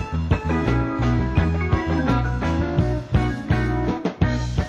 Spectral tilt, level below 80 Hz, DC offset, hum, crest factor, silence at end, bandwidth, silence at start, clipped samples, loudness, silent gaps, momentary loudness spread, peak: -8 dB/octave; -28 dBFS; under 0.1%; none; 14 dB; 0 s; 8.8 kHz; 0 s; under 0.1%; -22 LUFS; none; 2 LU; -6 dBFS